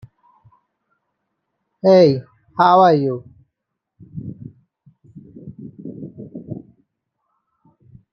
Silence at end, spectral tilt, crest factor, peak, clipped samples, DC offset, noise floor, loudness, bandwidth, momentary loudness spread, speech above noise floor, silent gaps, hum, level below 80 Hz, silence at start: 1.55 s; -8 dB/octave; 20 dB; -2 dBFS; under 0.1%; under 0.1%; -79 dBFS; -14 LUFS; 6.6 kHz; 25 LU; 66 dB; none; none; -64 dBFS; 1.85 s